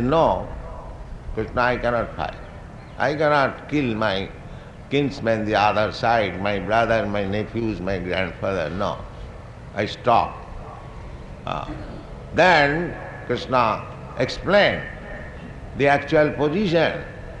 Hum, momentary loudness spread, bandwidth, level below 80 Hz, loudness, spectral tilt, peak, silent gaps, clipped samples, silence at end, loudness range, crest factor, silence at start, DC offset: none; 20 LU; 9.8 kHz; -40 dBFS; -22 LUFS; -6 dB/octave; -4 dBFS; none; under 0.1%; 0 s; 5 LU; 20 dB; 0 s; under 0.1%